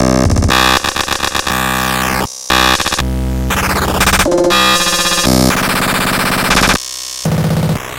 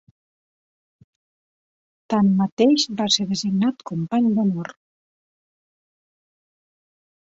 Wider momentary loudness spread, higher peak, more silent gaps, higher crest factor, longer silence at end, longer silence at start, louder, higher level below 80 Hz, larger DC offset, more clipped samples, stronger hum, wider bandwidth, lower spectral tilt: about the same, 6 LU vs 8 LU; first, 0 dBFS vs -4 dBFS; second, none vs 2.52-2.57 s; second, 12 dB vs 20 dB; second, 0 s vs 2.5 s; second, 0 s vs 2.1 s; first, -12 LUFS vs -20 LUFS; first, -24 dBFS vs -66 dBFS; neither; neither; neither; first, 17.5 kHz vs 8 kHz; second, -3.5 dB/octave vs -5 dB/octave